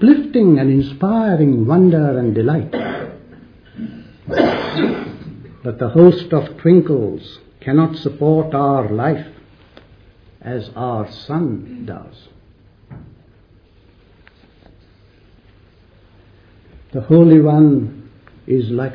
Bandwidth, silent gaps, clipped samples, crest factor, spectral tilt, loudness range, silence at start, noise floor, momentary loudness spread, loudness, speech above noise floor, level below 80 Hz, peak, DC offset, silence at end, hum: 5.4 kHz; none; under 0.1%; 16 dB; -10.5 dB/octave; 12 LU; 0 s; -49 dBFS; 21 LU; -15 LUFS; 35 dB; -48 dBFS; 0 dBFS; under 0.1%; 0 s; none